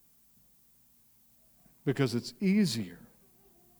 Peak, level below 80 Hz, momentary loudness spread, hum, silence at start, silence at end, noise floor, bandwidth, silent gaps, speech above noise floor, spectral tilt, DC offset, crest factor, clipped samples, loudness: -14 dBFS; -70 dBFS; 14 LU; none; 1.85 s; 0.85 s; -64 dBFS; over 20 kHz; none; 35 dB; -6 dB/octave; under 0.1%; 20 dB; under 0.1%; -31 LUFS